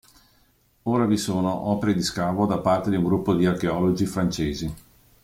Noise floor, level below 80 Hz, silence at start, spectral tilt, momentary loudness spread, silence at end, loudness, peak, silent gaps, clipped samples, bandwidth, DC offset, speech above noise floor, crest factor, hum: -62 dBFS; -48 dBFS; 0.85 s; -6 dB/octave; 6 LU; 0.45 s; -24 LUFS; -8 dBFS; none; under 0.1%; 16 kHz; under 0.1%; 39 dB; 16 dB; none